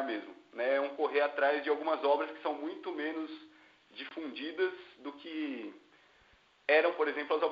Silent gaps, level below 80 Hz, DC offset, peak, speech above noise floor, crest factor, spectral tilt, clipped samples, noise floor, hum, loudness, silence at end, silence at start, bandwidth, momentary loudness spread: none; -86 dBFS; under 0.1%; -14 dBFS; 33 dB; 20 dB; 0.5 dB/octave; under 0.1%; -66 dBFS; none; -33 LUFS; 0 s; 0 s; 5.6 kHz; 17 LU